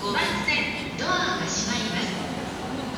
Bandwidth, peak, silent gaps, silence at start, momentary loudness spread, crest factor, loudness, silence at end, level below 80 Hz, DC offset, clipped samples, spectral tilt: over 20 kHz; -12 dBFS; none; 0 s; 8 LU; 16 dB; -26 LUFS; 0 s; -48 dBFS; under 0.1%; under 0.1%; -3 dB/octave